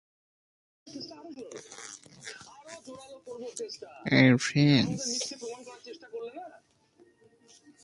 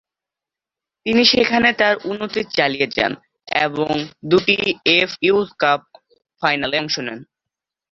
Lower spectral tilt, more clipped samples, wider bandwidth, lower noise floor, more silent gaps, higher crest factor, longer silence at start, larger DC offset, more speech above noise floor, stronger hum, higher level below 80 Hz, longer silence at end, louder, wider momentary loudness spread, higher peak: about the same, -5 dB/octave vs -4 dB/octave; neither; first, 11.5 kHz vs 7.4 kHz; second, -63 dBFS vs -88 dBFS; neither; first, 26 dB vs 18 dB; second, 0.85 s vs 1.05 s; neither; second, 33 dB vs 69 dB; neither; second, -66 dBFS vs -56 dBFS; first, 1.35 s vs 0.7 s; second, -27 LUFS vs -17 LUFS; first, 24 LU vs 10 LU; second, -6 dBFS vs -2 dBFS